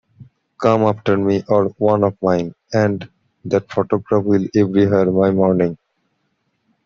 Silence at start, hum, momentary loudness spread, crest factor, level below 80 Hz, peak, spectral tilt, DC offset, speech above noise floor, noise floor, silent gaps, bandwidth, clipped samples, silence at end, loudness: 0.2 s; none; 6 LU; 16 dB; -56 dBFS; -2 dBFS; -8.5 dB/octave; under 0.1%; 52 dB; -68 dBFS; none; 7.2 kHz; under 0.1%; 1.1 s; -17 LUFS